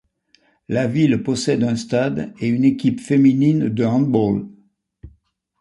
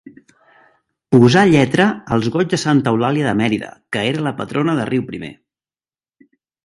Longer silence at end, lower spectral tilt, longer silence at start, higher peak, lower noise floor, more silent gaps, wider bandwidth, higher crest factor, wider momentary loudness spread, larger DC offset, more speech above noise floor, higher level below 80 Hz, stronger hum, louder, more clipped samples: second, 0.55 s vs 1.35 s; about the same, -7 dB/octave vs -6 dB/octave; second, 0.7 s vs 1.1 s; second, -4 dBFS vs 0 dBFS; second, -60 dBFS vs under -90 dBFS; neither; about the same, 11 kHz vs 11.5 kHz; about the same, 16 dB vs 18 dB; second, 8 LU vs 12 LU; neither; second, 42 dB vs over 74 dB; about the same, -52 dBFS vs -52 dBFS; neither; about the same, -18 LUFS vs -16 LUFS; neither